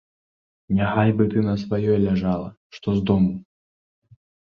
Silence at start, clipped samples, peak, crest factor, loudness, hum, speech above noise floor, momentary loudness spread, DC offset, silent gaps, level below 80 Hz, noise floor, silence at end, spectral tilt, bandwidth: 0.7 s; under 0.1%; -4 dBFS; 20 dB; -22 LUFS; none; over 69 dB; 10 LU; under 0.1%; 2.57-2.70 s; -46 dBFS; under -90 dBFS; 1.1 s; -9.5 dB/octave; 6.6 kHz